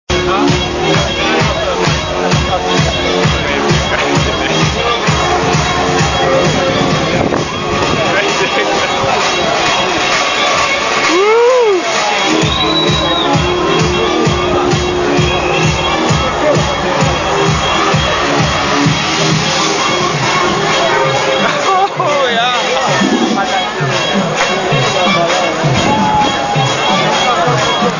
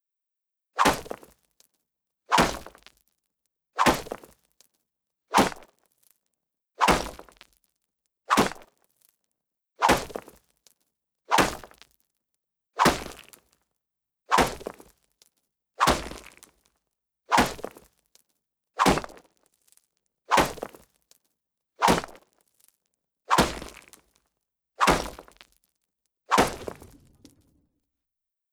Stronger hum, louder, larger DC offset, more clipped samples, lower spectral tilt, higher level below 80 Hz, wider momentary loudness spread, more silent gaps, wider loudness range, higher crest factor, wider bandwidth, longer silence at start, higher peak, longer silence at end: neither; first, -12 LUFS vs -24 LUFS; neither; neither; about the same, -4 dB/octave vs -3.5 dB/octave; first, -30 dBFS vs -48 dBFS; second, 2 LU vs 19 LU; neither; about the same, 2 LU vs 1 LU; second, 12 dB vs 26 dB; second, 7.4 kHz vs over 20 kHz; second, 0.1 s vs 0.75 s; first, 0 dBFS vs -4 dBFS; second, 0 s vs 1.8 s